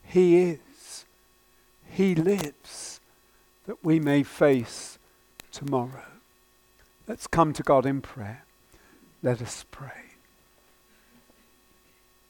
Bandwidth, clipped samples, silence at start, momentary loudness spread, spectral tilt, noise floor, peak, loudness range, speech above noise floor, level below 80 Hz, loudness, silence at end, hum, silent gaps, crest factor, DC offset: 19 kHz; under 0.1%; 0.1 s; 22 LU; -6.5 dB/octave; -62 dBFS; -6 dBFS; 11 LU; 37 dB; -58 dBFS; -25 LUFS; 2.3 s; none; none; 22 dB; under 0.1%